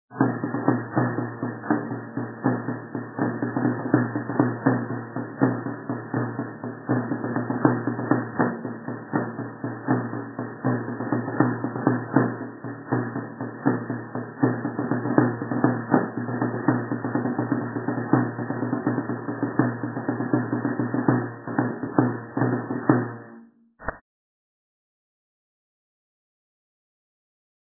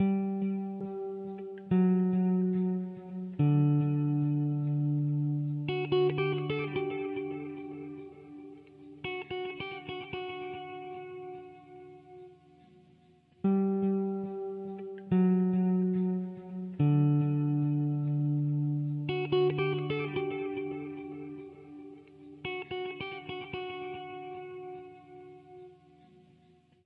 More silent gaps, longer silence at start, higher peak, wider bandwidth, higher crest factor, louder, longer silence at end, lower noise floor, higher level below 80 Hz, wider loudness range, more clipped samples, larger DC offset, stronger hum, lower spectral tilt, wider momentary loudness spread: neither; about the same, 0.1 s vs 0 s; first, -2 dBFS vs -16 dBFS; second, 2 kHz vs 4.6 kHz; first, 24 dB vs 16 dB; first, -26 LUFS vs -31 LUFS; first, 3.7 s vs 1.1 s; second, -49 dBFS vs -63 dBFS; first, -64 dBFS vs -72 dBFS; second, 3 LU vs 12 LU; neither; neither; neither; first, -15 dB/octave vs -11 dB/octave; second, 10 LU vs 21 LU